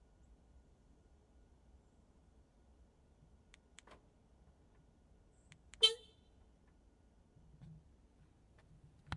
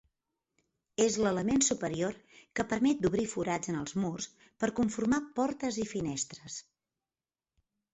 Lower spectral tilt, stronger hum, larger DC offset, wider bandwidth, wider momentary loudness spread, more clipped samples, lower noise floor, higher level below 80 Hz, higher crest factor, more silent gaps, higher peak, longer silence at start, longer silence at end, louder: second, -1.5 dB/octave vs -4.5 dB/octave; neither; neither; first, 10.5 kHz vs 8.2 kHz; first, 31 LU vs 13 LU; neither; second, -68 dBFS vs under -90 dBFS; second, -70 dBFS vs -60 dBFS; first, 32 dB vs 18 dB; neither; about the same, -16 dBFS vs -14 dBFS; first, 5.8 s vs 1 s; second, 0 s vs 1.35 s; about the same, -33 LUFS vs -32 LUFS